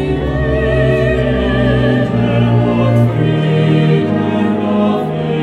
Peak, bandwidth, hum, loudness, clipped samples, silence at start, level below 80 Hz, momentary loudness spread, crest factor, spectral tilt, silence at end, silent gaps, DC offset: 0 dBFS; 8.6 kHz; none; -13 LUFS; under 0.1%; 0 s; -26 dBFS; 3 LU; 12 dB; -8.5 dB/octave; 0 s; none; under 0.1%